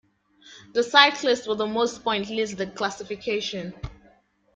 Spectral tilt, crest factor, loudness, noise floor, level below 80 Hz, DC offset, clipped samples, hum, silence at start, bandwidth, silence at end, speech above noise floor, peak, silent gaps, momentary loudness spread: -3 dB/octave; 24 dB; -23 LUFS; -60 dBFS; -52 dBFS; under 0.1%; under 0.1%; none; 0.45 s; 9.2 kHz; 0.6 s; 36 dB; -2 dBFS; none; 17 LU